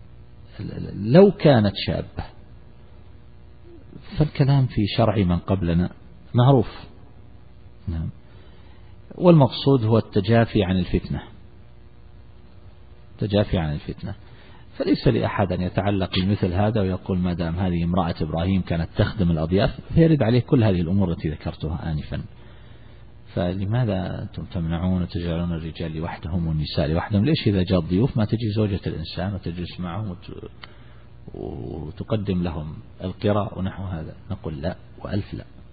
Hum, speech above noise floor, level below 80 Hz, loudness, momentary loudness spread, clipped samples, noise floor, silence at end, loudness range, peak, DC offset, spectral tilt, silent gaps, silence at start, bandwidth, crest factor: none; 26 dB; -40 dBFS; -23 LUFS; 16 LU; under 0.1%; -47 dBFS; 0.3 s; 8 LU; 0 dBFS; 0.5%; -12 dB/octave; none; 0 s; 4.9 kHz; 22 dB